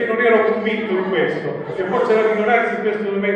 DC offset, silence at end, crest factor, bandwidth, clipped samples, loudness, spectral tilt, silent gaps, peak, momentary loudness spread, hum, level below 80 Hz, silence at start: under 0.1%; 0 s; 16 dB; 8.4 kHz; under 0.1%; -18 LUFS; -7 dB/octave; none; -2 dBFS; 7 LU; none; -62 dBFS; 0 s